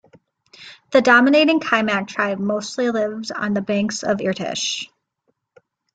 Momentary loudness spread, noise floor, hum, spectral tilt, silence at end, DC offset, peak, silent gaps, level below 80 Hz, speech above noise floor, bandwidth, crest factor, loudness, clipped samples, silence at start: 11 LU; -71 dBFS; none; -4 dB/octave; 1.1 s; under 0.1%; -2 dBFS; none; -64 dBFS; 52 dB; 9.2 kHz; 18 dB; -19 LUFS; under 0.1%; 0.6 s